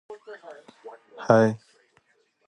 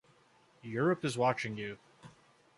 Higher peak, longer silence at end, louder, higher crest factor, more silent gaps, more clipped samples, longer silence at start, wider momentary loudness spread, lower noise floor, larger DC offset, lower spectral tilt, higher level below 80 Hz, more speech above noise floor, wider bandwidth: first, -2 dBFS vs -16 dBFS; first, 0.9 s vs 0.5 s; first, -21 LUFS vs -34 LUFS; about the same, 24 dB vs 20 dB; neither; neither; second, 0.1 s vs 0.65 s; first, 27 LU vs 17 LU; about the same, -66 dBFS vs -66 dBFS; neither; first, -7.5 dB/octave vs -6 dB/octave; about the same, -70 dBFS vs -74 dBFS; first, 40 dB vs 33 dB; second, 9.4 kHz vs 11.5 kHz